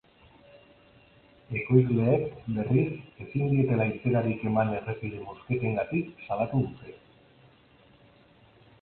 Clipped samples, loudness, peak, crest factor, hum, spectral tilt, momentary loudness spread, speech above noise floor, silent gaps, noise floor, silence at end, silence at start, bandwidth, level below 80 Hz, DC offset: under 0.1%; -28 LUFS; -8 dBFS; 22 dB; none; -12.5 dB/octave; 12 LU; 31 dB; none; -59 dBFS; 1.85 s; 1.5 s; 4.2 kHz; -58 dBFS; under 0.1%